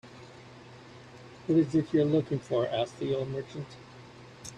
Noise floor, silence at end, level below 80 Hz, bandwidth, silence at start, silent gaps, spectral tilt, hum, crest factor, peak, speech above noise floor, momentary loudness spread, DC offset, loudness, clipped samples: -50 dBFS; 0 s; -64 dBFS; 10.5 kHz; 0.05 s; none; -7 dB/octave; none; 16 dB; -14 dBFS; 21 dB; 24 LU; under 0.1%; -29 LUFS; under 0.1%